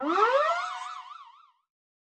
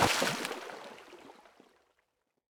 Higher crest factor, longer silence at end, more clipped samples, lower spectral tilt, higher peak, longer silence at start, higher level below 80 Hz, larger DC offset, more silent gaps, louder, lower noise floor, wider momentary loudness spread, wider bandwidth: second, 18 dB vs 24 dB; second, 0.9 s vs 1.2 s; neither; about the same, -1.5 dB/octave vs -2.5 dB/octave; about the same, -12 dBFS vs -12 dBFS; about the same, 0 s vs 0 s; second, under -90 dBFS vs -62 dBFS; neither; neither; first, -26 LUFS vs -33 LUFS; second, -54 dBFS vs -79 dBFS; about the same, 23 LU vs 24 LU; second, 9.4 kHz vs over 20 kHz